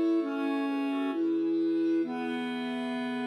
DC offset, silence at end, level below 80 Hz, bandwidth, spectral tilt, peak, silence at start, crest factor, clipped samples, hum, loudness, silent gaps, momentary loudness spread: under 0.1%; 0 s; -90 dBFS; 10 kHz; -6 dB/octave; -20 dBFS; 0 s; 10 dB; under 0.1%; none; -30 LUFS; none; 5 LU